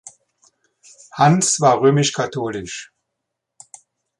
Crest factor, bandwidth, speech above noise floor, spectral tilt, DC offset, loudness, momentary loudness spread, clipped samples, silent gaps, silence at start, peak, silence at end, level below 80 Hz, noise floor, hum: 18 dB; 11.5 kHz; 63 dB; -4.5 dB/octave; under 0.1%; -17 LUFS; 17 LU; under 0.1%; none; 0.05 s; -2 dBFS; 1.35 s; -58 dBFS; -79 dBFS; none